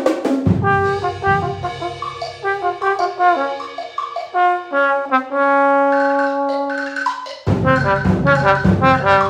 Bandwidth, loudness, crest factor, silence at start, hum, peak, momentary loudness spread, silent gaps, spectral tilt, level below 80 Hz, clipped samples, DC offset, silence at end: 10 kHz; -17 LUFS; 16 dB; 0 s; none; 0 dBFS; 11 LU; none; -7 dB/octave; -40 dBFS; under 0.1%; under 0.1%; 0 s